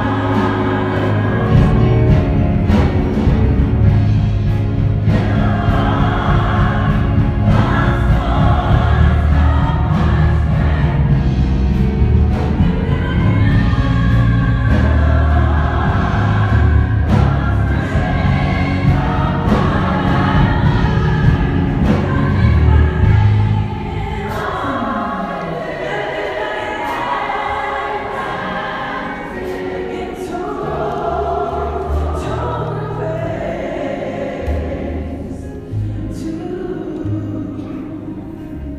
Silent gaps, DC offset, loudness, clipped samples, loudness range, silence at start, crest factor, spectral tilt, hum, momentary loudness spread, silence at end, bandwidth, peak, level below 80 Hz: none; under 0.1%; -16 LUFS; under 0.1%; 8 LU; 0 s; 14 dB; -8.5 dB/octave; none; 10 LU; 0 s; 7.8 kHz; 0 dBFS; -20 dBFS